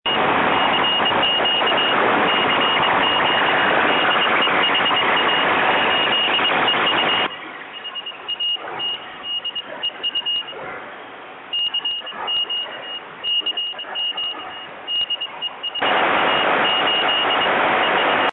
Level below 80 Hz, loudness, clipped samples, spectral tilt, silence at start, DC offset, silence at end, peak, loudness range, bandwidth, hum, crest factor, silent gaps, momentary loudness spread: -58 dBFS; -18 LUFS; under 0.1%; -6 dB/octave; 0.05 s; under 0.1%; 0 s; -6 dBFS; 8 LU; 4.5 kHz; none; 14 dB; none; 12 LU